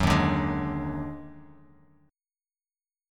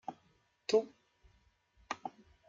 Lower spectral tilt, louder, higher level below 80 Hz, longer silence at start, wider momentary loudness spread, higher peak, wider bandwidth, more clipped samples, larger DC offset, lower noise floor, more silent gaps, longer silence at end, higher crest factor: first, -6.5 dB/octave vs -3.5 dB/octave; first, -28 LUFS vs -37 LUFS; first, -42 dBFS vs -74 dBFS; about the same, 0 s vs 0.1 s; first, 19 LU vs 16 LU; first, -8 dBFS vs -16 dBFS; first, 16.5 kHz vs 7.8 kHz; neither; neither; first, under -90 dBFS vs -73 dBFS; neither; first, 1.6 s vs 0.4 s; about the same, 22 dB vs 24 dB